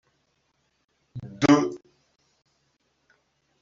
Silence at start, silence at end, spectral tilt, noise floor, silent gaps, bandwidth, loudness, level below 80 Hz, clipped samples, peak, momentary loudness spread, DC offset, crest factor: 1.15 s; 1.85 s; -5.5 dB/octave; -72 dBFS; none; 7.6 kHz; -22 LUFS; -64 dBFS; under 0.1%; -4 dBFS; 24 LU; under 0.1%; 24 dB